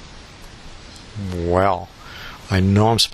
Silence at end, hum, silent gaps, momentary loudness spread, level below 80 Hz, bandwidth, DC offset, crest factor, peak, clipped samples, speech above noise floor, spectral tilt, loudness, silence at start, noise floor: 0 s; none; none; 25 LU; -42 dBFS; 13.5 kHz; under 0.1%; 20 dB; -2 dBFS; under 0.1%; 22 dB; -5.5 dB/octave; -19 LUFS; 0 s; -40 dBFS